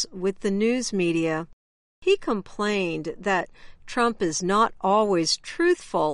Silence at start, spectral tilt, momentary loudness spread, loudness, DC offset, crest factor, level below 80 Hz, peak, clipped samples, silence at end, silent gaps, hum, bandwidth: 0 s; -4 dB/octave; 8 LU; -24 LUFS; under 0.1%; 14 dB; -52 dBFS; -10 dBFS; under 0.1%; 0 s; 1.53-2.02 s; none; 11.5 kHz